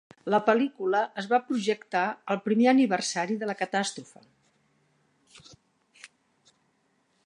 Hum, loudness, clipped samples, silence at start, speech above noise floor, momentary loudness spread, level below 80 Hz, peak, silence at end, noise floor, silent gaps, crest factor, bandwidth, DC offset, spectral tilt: none; -26 LUFS; under 0.1%; 0.25 s; 44 dB; 8 LU; -80 dBFS; -8 dBFS; 1.2 s; -71 dBFS; none; 22 dB; 11 kHz; under 0.1%; -4.5 dB/octave